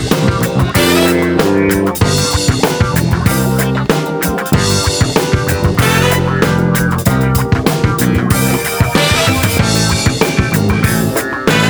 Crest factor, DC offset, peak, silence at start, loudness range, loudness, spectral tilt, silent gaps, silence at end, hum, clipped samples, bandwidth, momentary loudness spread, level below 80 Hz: 12 dB; under 0.1%; 0 dBFS; 0 s; 1 LU; -12 LUFS; -5 dB/octave; none; 0 s; none; under 0.1%; over 20 kHz; 3 LU; -26 dBFS